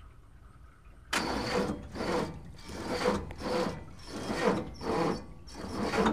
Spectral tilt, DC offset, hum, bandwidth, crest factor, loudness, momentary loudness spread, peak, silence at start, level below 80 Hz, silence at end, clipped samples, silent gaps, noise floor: -5 dB/octave; 0.2%; none; 15.5 kHz; 20 dB; -33 LUFS; 13 LU; -12 dBFS; 0 s; -50 dBFS; 0 s; under 0.1%; none; -54 dBFS